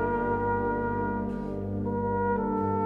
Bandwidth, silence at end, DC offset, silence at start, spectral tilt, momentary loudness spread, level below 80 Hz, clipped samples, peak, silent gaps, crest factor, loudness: 4.4 kHz; 0 s; under 0.1%; 0 s; -10.5 dB/octave; 5 LU; -44 dBFS; under 0.1%; -16 dBFS; none; 12 dB; -29 LUFS